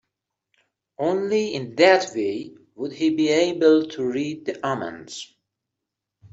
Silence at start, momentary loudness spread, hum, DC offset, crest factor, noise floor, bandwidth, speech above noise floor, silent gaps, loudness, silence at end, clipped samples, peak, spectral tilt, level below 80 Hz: 1 s; 18 LU; none; under 0.1%; 20 dB; -84 dBFS; 8 kHz; 62 dB; none; -22 LUFS; 0.05 s; under 0.1%; -4 dBFS; -4.5 dB/octave; -68 dBFS